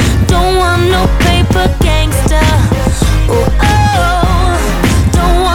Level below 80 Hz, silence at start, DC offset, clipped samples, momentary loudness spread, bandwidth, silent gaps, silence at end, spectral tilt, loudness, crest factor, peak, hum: -14 dBFS; 0 s; under 0.1%; under 0.1%; 2 LU; 17 kHz; none; 0 s; -5.5 dB/octave; -10 LUFS; 8 dB; 0 dBFS; none